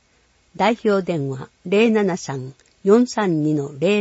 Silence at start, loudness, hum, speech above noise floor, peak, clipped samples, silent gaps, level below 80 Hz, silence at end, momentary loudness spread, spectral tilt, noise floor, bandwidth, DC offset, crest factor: 0.55 s; -20 LUFS; none; 41 dB; -4 dBFS; under 0.1%; none; -62 dBFS; 0 s; 13 LU; -6 dB/octave; -60 dBFS; 8 kHz; under 0.1%; 16 dB